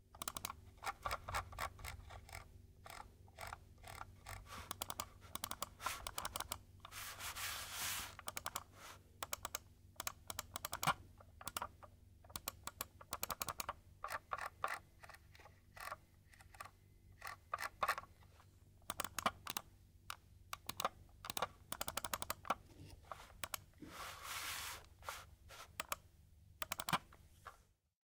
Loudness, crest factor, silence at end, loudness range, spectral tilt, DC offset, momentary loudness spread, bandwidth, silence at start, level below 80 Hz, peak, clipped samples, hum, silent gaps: -46 LUFS; 28 dB; 0.55 s; 5 LU; -1.5 dB/octave; under 0.1%; 18 LU; 18 kHz; 0 s; -64 dBFS; -20 dBFS; under 0.1%; none; none